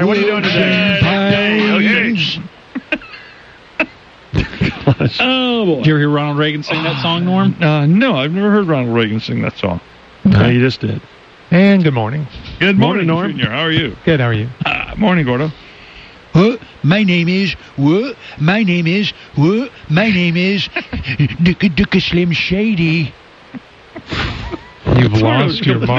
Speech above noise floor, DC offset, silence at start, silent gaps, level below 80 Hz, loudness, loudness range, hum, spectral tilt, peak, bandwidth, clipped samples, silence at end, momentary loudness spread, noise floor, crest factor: 26 dB; under 0.1%; 0 s; none; -38 dBFS; -14 LUFS; 3 LU; none; -7.5 dB/octave; -2 dBFS; 7.2 kHz; under 0.1%; 0 s; 10 LU; -40 dBFS; 12 dB